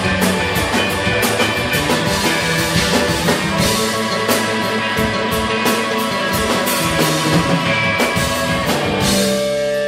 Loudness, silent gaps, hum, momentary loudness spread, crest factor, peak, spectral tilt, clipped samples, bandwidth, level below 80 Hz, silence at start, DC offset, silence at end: -16 LUFS; none; none; 3 LU; 16 dB; -2 dBFS; -3.5 dB/octave; under 0.1%; 16.5 kHz; -36 dBFS; 0 s; under 0.1%; 0 s